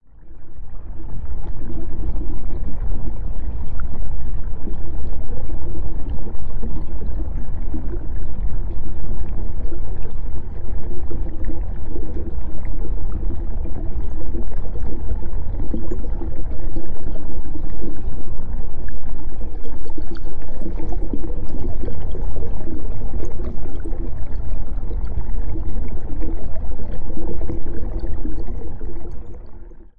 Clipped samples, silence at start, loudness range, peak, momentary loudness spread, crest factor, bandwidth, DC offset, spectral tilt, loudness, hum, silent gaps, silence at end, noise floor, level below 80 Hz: under 0.1%; 0.2 s; 2 LU; -4 dBFS; 5 LU; 6 dB; 1.9 kHz; under 0.1%; -10 dB/octave; -31 LUFS; none; none; 0.35 s; -31 dBFS; -24 dBFS